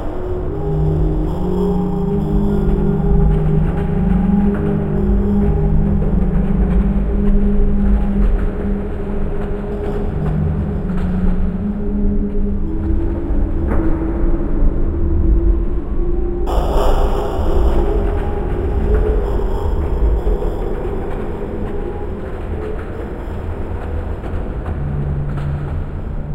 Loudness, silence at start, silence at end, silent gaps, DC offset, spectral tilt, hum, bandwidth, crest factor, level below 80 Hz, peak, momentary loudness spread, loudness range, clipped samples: -19 LUFS; 0 s; 0 s; none; under 0.1%; -9.5 dB/octave; none; 7.4 kHz; 14 dB; -18 dBFS; -2 dBFS; 8 LU; 7 LU; under 0.1%